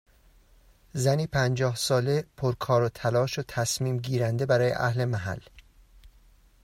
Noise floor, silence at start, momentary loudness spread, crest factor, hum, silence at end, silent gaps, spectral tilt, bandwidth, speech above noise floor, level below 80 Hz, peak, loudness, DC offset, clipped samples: -58 dBFS; 0.95 s; 6 LU; 16 dB; none; 0.55 s; none; -5 dB/octave; 16 kHz; 32 dB; -56 dBFS; -10 dBFS; -27 LUFS; under 0.1%; under 0.1%